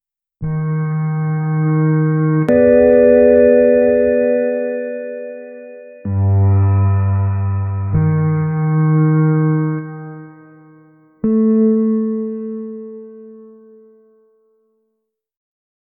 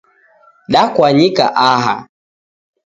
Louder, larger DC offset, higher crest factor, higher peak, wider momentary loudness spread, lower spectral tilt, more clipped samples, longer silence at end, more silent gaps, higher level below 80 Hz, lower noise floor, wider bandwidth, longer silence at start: second, -15 LUFS vs -12 LUFS; neither; about the same, 16 dB vs 14 dB; about the same, 0 dBFS vs 0 dBFS; first, 20 LU vs 6 LU; first, -13 dB/octave vs -5.5 dB/octave; neither; first, 2.5 s vs 0.85 s; neither; first, -46 dBFS vs -54 dBFS; first, -74 dBFS vs -50 dBFS; second, 2.7 kHz vs 7.8 kHz; second, 0.4 s vs 0.7 s